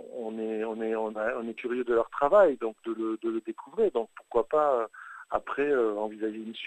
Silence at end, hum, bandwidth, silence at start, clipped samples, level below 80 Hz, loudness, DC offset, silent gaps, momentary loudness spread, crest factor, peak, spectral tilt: 0 s; none; 8.6 kHz; 0 s; under 0.1%; -64 dBFS; -29 LUFS; under 0.1%; none; 11 LU; 18 dB; -10 dBFS; -6 dB/octave